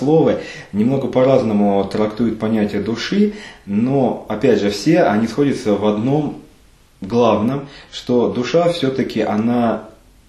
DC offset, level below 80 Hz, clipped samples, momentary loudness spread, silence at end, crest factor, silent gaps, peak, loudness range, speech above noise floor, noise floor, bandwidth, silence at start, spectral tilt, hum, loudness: under 0.1%; -48 dBFS; under 0.1%; 9 LU; 0.4 s; 16 dB; none; 0 dBFS; 2 LU; 32 dB; -49 dBFS; 12.5 kHz; 0 s; -7 dB/octave; none; -17 LUFS